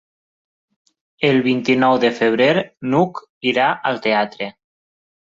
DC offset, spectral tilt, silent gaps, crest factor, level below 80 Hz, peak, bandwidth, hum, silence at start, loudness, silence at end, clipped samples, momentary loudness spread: under 0.1%; -6 dB/octave; 3.29-3.41 s; 16 dB; -62 dBFS; -2 dBFS; 7.6 kHz; none; 1.2 s; -17 LUFS; 0.8 s; under 0.1%; 8 LU